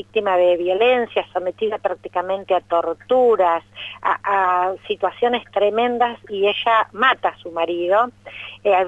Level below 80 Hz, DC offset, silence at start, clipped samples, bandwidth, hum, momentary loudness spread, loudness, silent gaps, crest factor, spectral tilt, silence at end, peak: -60 dBFS; under 0.1%; 0.15 s; under 0.1%; 7.8 kHz; none; 8 LU; -19 LUFS; none; 14 dB; -5.5 dB/octave; 0 s; -4 dBFS